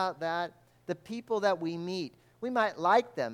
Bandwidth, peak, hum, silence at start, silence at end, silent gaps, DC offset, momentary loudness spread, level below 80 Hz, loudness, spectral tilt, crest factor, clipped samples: 15.5 kHz; -12 dBFS; none; 0 s; 0 s; none; under 0.1%; 14 LU; -76 dBFS; -31 LUFS; -5.5 dB/octave; 18 dB; under 0.1%